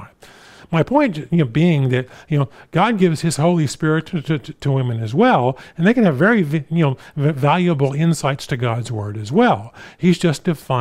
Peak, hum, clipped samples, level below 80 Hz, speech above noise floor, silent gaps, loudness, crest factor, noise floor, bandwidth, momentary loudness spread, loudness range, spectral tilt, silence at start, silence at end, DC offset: -2 dBFS; none; under 0.1%; -52 dBFS; 27 dB; none; -18 LUFS; 14 dB; -45 dBFS; 13.5 kHz; 8 LU; 2 LU; -6.5 dB/octave; 0 s; 0 s; under 0.1%